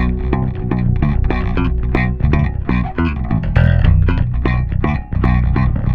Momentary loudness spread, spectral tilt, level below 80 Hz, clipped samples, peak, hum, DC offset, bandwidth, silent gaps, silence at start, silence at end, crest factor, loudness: 5 LU; -10 dB/octave; -18 dBFS; under 0.1%; 0 dBFS; none; under 0.1%; 5 kHz; none; 0 s; 0 s; 14 dB; -17 LUFS